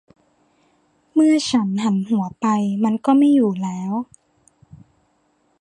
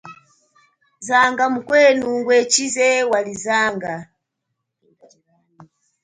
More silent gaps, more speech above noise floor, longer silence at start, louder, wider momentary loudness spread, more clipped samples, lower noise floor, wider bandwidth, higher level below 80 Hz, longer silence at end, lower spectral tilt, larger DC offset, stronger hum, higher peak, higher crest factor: neither; second, 46 dB vs 60 dB; first, 1.15 s vs 0.05 s; about the same, -19 LUFS vs -17 LUFS; about the same, 10 LU vs 12 LU; neither; second, -64 dBFS vs -77 dBFS; first, 11 kHz vs 9.6 kHz; about the same, -64 dBFS vs -64 dBFS; first, 1.55 s vs 0.4 s; first, -6 dB/octave vs -2 dB/octave; neither; neither; about the same, -4 dBFS vs -2 dBFS; about the same, 16 dB vs 18 dB